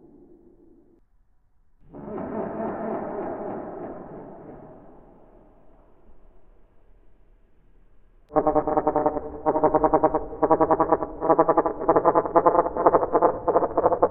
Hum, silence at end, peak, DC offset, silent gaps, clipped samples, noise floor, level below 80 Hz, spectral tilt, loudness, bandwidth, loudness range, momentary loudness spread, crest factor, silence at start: none; 0 s; 0 dBFS; under 0.1%; none; under 0.1%; -60 dBFS; -48 dBFS; -9.5 dB/octave; -23 LUFS; 2.8 kHz; 15 LU; 17 LU; 24 dB; 1.95 s